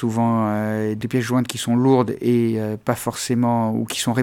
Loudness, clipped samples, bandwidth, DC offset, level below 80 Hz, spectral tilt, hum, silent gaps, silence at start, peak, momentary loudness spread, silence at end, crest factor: -20 LUFS; under 0.1%; 17 kHz; under 0.1%; -58 dBFS; -6 dB/octave; none; none; 0 s; -2 dBFS; 6 LU; 0 s; 18 dB